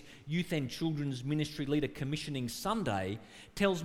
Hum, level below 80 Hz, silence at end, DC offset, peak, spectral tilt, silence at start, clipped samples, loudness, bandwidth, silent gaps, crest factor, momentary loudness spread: none; -58 dBFS; 0 s; under 0.1%; -16 dBFS; -5.5 dB/octave; 0 s; under 0.1%; -35 LUFS; 17 kHz; none; 18 dB; 4 LU